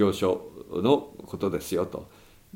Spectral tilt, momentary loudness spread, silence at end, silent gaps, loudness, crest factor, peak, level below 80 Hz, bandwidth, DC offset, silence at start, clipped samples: -6 dB/octave; 12 LU; 0.5 s; none; -28 LUFS; 20 dB; -8 dBFS; -58 dBFS; 16.5 kHz; under 0.1%; 0 s; under 0.1%